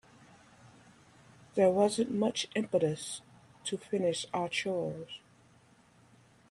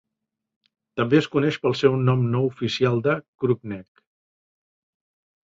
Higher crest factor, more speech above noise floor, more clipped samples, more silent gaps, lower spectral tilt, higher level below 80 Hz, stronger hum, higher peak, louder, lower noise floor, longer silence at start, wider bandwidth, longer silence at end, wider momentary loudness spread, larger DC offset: about the same, 20 dB vs 20 dB; second, 32 dB vs 61 dB; neither; second, none vs 3.28-3.39 s; second, -4.5 dB/octave vs -7.5 dB/octave; second, -74 dBFS vs -60 dBFS; neither; second, -14 dBFS vs -4 dBFS; second, -32 LUFS vs -22 LUFS; second, -63 dBFS vs -83 dBFS; second, 0.65 s vs 0.95 s; first, 12.5 kHz vs 7.6 kHz; second, 1.35 s vs 1.6 s; first, 15 LU vs 8 LU; neither